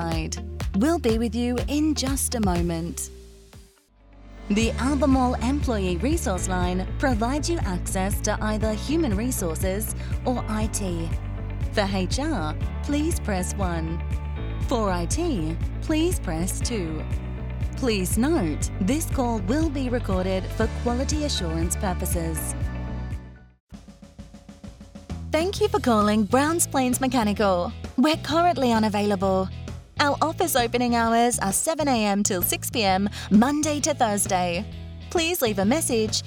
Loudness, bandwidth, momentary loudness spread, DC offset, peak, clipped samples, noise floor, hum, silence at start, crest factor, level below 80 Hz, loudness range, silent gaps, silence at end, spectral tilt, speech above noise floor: -24 LUFS; 19 kHz; 10 LU; under 0.1%; -4 dBFS; under 0.1%; -54 dBFS; none; 0 s; 20 dB; -32 dBFS; 5 LU; 23.60-23.67 s; 0 s; -5 dB/octave; 31 dB